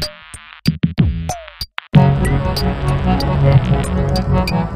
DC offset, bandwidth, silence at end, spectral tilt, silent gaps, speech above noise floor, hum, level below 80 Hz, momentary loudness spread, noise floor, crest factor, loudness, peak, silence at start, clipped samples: under 0.1%; 15 kHz; 0 s; -7 dB/octave; none; 22 dB; none; -24 dBFS; 13 LU; -37 dBFS; 16 dB; -16 LUFS; 0 dBFS; 0 s; under 0.1%